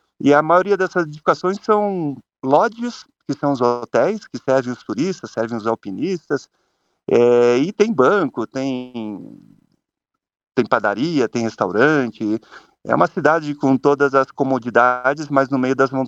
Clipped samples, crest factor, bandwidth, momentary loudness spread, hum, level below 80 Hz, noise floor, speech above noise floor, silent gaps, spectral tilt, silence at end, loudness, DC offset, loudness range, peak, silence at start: under 0.1%; 18 dB; 8 kHz; 11 LU; none; -64 dBFS; -81 dBFS; 63 dB; none; -6.5 dB/octave; 0 s; -18 LUFS; under 0.1%; 4 LU; 0 dBFS; 0.2 s